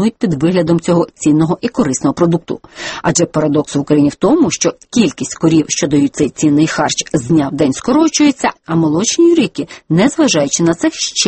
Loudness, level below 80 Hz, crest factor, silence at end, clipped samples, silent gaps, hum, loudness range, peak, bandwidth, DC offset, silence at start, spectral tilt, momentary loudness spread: -13 LUFS; -46 dBFS; 12 dB; 0 s; under 0.1%; none; none; 2 LU; 0 dBFS; 8.8 kHz; under 0.1%; 0 s; -4.5 dB/octave; 5 LU